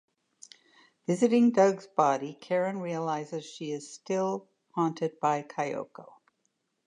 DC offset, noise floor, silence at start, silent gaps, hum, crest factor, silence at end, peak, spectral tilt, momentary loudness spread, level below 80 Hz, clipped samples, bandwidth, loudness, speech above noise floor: under 0.1%; -78 dBFS; 1.1 s; none; none; 20 dB; 0.8 s; -10 dBFS; -6 dB/octave; 16 LU; -84 dBFS; under 0.1%; 10 kHz; -29 LUFS; 49 dB